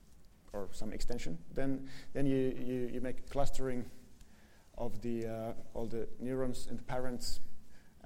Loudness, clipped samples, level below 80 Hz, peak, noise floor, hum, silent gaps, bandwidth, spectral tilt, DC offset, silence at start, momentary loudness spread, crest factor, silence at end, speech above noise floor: -40 LUFS; under 0.1%; -44 dBFS; -18 dBFS; -58 dBFS; none; none; 12 kHz; -6 dB/octave; under 0.1%; 0.1 s; 10 LU; 14 dB; 0 s; 27 dB